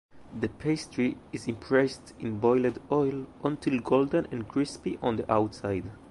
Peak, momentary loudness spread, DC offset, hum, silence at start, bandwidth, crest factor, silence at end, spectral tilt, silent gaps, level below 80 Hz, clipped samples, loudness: -10 dBFS; 10 LU; under 0.1%; none; 0.15 s; 11.5 kHz; 18 dB; 0 s; -6.5 dB/octave; none; -56 dBFS; under 0.1%; -29 LUFS